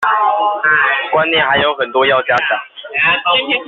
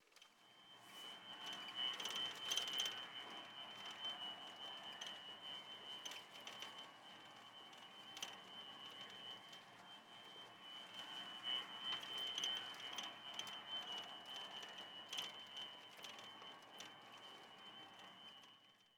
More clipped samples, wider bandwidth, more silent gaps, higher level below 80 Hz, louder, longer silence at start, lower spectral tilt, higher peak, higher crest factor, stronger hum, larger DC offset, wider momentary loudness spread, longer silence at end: neither; second, 7.6 kHz vs 19.5 kHz; neither; first, -54 dBFS vs under -90 dBFS; first, -13 LUFS vs -49 LUFS; about the same, 0 s vs 0 s; about the same, 0.5 dB/octave vs 0 dB/octave; first, -2 dBFS vs -26 dBFS; second, 12 dB vs 26 dB; neither; neither; second, 3 LU vs 15 LU; about the same, 0 s vs 0 s